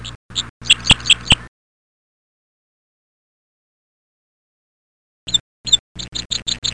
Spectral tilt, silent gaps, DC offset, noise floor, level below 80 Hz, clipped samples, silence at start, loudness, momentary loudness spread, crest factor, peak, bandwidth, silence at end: -1 dB/octave; 0.15-0.29 s, 0.49-0.60 s, 1.48-5.27 s, 5.40-5.64 s, 5.79-5.95 s, 6.25-6.30 s; under 0.1%; under -90 dBFS; -40 dBFS; under 0.1%; 0 s; -16 LUFS; 14 LU; 22 dB; 0 dBFS; 10.5 kHz; 0 s